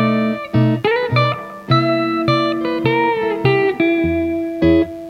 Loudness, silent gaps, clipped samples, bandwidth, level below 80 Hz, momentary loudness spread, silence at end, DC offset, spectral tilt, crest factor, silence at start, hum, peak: -17 LUFS; none; under 0.1%; 6.2 kHz; -40 dBFS; 4 LU; 0 s; under 0.1%; -8 dB/octave; 14 dB; 0 s; none; -2 dBFS